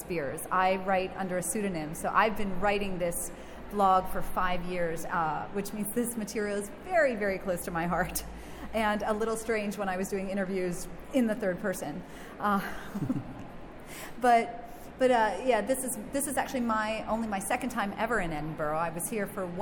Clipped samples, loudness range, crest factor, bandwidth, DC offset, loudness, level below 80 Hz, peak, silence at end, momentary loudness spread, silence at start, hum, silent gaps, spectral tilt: under 0.1%; 3 LU; 20 dB; 17.5 kHz; under 0.1%; -30 LUFS; -48 dBFS; -10 dBFS; 0 s; 11 LU; 0 s; none; none; -4.5 dB/octave